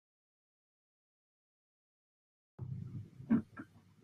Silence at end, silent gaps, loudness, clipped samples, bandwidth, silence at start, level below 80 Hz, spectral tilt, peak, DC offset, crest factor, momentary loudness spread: 0.25 s; none; -39 LUFS; under 0.1%; 3.8 kHz; 2.6 s; -74 dBFS; -10 dB/octave; -20 dBFS; under 0.1%; 24 dB; 18 LU